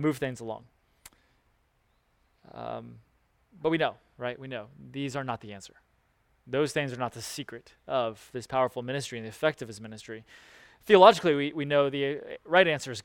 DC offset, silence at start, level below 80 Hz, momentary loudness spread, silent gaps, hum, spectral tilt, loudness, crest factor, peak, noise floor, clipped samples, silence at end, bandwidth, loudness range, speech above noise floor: under 0.1%; 0 s; -66 dBFS; 20 LU; none; none; -5 dB/octave; -27 LUFS; 26 dB; -4 dBFS; -70 dBFS; under 0.1%; 0.05 s; 17.5 kHz; 11 LU; 42 dB